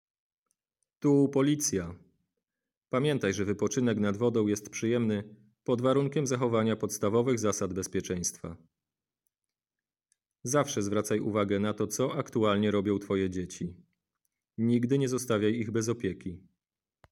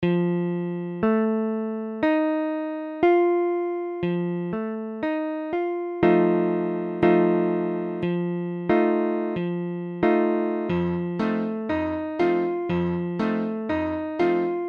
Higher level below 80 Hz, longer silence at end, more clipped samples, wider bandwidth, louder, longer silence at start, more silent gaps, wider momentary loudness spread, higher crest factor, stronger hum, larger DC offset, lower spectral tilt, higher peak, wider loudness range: second, -66 dBFS vs -56 dBFS; first, 0.75 s vs 0 s; neither; first, 16.5 kHz vs 5.2 kHz; second, -29 LUFS vs -24 LUFS; first, 1 s vs 0 s; first, 2.77-2.81 s vs none; about the same, 10 LU vs 8 LU; about the same, 18 dB vs 20 dB; neither; neither; second, -5.5 dB/octave vs -9.5 dB/octave; second, -12 dBFS vs -4 dBFS; about the same, 4 LU vs 2 LU